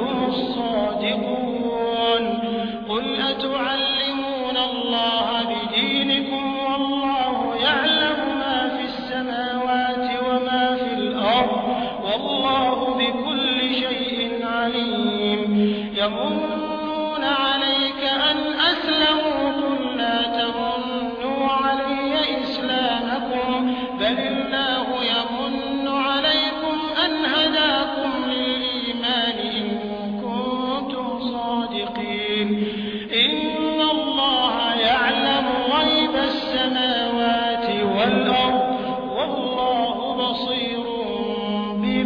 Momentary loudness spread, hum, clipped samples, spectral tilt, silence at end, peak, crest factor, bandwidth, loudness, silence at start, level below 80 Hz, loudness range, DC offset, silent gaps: 7 LU; none; under 0.1%; -6 dB/octave; 0 s; -6 dBFS; 16 dB; 5.4 kHz; -21 LUFS; 0 s; -52 dBFS; 3 LU; under 0.1%; none